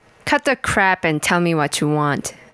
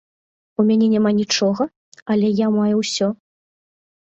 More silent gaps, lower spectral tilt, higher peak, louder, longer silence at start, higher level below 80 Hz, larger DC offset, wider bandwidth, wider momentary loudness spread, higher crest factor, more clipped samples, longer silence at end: second, none vs 1.76-1.92 s, 2.02-2.06 s; about the same, -4.5 dB/octave vs -5 dB/octave; first, -2 dBFS vs -6 dBFS; about the same, -18 LUFS vs -18 LUFS; second, 0.25 s vs 0.6 s; first, -48 dBFS vs -64 dBFS; neither; first, 11 kHz vs 8.2 kHz; second, 4 LU vs 10 LU; about the same, 16 dB vs 14 dB; neither; second, 0.2 s vs 0.9 s